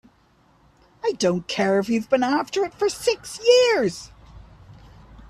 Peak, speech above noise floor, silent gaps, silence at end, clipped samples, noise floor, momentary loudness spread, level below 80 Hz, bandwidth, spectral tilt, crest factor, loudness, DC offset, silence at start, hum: -4 dBFS; 38 dB; none; 0.1 s; under 0.1%; -59 dBFS; 10 LU; -54 dBFS; 13.5 kHz; -4 dB/octave; 18 dB; -21 LUFS; under 0.1%; 1.05 s; none